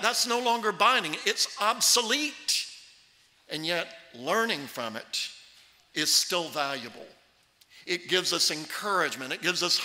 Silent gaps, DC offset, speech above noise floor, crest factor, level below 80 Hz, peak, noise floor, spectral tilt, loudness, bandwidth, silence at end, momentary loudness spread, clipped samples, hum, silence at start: none; under 0.1%; 35 dB; 22 dB; -80 dBFS; -8 dBFS; -63 dBFS; -0.5 dB/octave; -26 LUFS; 16 kHz; 0 s; 13 LU; under 0.1%; none; 0 s